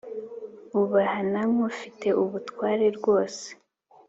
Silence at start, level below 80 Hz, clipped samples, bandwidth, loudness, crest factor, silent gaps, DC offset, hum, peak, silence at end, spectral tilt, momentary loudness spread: 0.05 s; -70 dBFS; under 0.1%; 8 kHz; -25 LUFS; 16 dB; none; under 0.1%; none; -10 dBFS; 0.55 s; -6 dB/octave; 15 LU